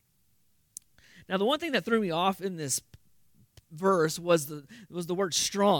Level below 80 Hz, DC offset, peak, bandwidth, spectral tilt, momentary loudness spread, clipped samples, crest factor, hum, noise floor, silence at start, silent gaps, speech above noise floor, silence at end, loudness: -70 dBFS; under 0.1%; -10 dBFS; 18 kHz; -3.5 dB/octave; 18 LU; under 0.1%; 20 dB; none; -71 dBFS; 1.3 s; none; 43 dB; 0 s; -28 LUFS